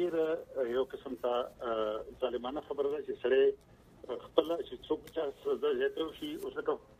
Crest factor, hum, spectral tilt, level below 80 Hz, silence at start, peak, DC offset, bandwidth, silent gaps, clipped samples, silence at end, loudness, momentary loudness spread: 24 dB; none; -5.5 dB/octave; -64 dBFS; 0 s; -10 dBFS; under 0.1%; 15.5 kHz; none; under 0.1%; 0.2 s; -35 LUFS; 8 LU